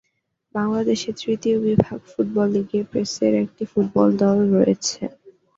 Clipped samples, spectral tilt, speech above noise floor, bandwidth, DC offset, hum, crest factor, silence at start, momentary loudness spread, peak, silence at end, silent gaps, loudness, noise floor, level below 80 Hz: under 0.1%; -6 dB/octave; 50 dB; 7.8 kHz; under 0.1%; none; 20 dB; 0.55 s; 8 LU; 0 dBFS; 0.25 s; none; -21 LUFS; -70 dBFS; -54 dBFS